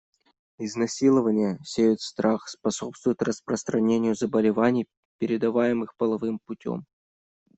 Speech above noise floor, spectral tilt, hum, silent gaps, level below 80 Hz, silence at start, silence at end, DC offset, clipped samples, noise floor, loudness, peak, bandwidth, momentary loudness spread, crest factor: over 66 dB; -5.5 dB/octave; none; 4.97-5.19 s; -66 dBFS; 0.6 s; 0.75 s; under 0.1%; under 0.1%; under -90 dBFS; -25 LUFS; -8 dBFS; 8.2 kHz; 11 LU; 18 dB